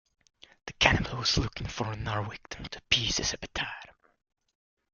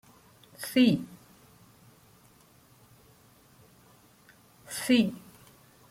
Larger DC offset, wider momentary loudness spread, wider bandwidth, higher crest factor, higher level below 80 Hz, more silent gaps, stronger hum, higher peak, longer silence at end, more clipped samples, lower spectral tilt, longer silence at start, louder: neither; second, 17 LU vs 20 LU; second, 7.4 kHz vs 16 kHz; first, 30 dB vs 22 dB; first, -46 dBFS vs -70 dBFS; neither; neither; first, -4 dBFS vs -10 dBFS; first, 1.1 s vs 0.7 s; neither; second, -3 dB/octave vs -5 dB/octave; about the same, 0.65 s vs 0.6 s; about the same, -29 LUFS vs -27 LUFS